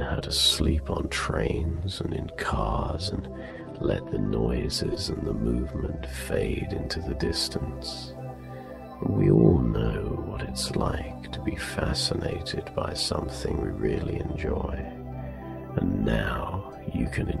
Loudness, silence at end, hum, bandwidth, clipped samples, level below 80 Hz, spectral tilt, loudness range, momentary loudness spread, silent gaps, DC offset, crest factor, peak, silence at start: -28 LUFS; 0 s; none; 13.5 kHz; under 0.1%; -36 dBFS; -5.5 dB/octave; 4 LU; 13 LU; none; under 0.1%; 22 dB; -4 dBFS; 0 s